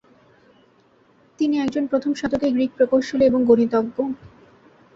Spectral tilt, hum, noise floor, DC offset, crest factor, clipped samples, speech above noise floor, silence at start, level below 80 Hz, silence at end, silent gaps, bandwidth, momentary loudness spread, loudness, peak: -6.5 dB/octave; none; -57 dBFS; under 0.1%; 18 dB; under 0.1%; 38 dB; 1.4 s; -56 dBFS; 0.7 s; none; 7.8 kHz; 9 LU; -20 LUFS; -4 dBFS